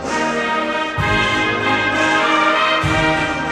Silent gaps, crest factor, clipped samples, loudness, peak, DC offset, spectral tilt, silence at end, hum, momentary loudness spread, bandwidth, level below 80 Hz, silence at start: none; 14 dB; under 0.1%; -16 LUFS; -4 dBFS; under 0.1%; -4 dB/octave; 0 s; none; 5 LU; 13.5 kHz; -38 dBFS; 0 s